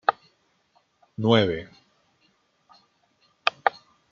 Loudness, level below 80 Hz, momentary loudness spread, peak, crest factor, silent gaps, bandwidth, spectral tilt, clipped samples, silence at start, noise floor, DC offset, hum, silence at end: -24 LUFS; -64 dBFS; 24 LU; 0 dBFS; 28 dB; none; 7.2 kHz; -6.5 dB/octave; under 0.1%; 0.1 s; -67 dBFS; under 0.1%; none; 0.4 s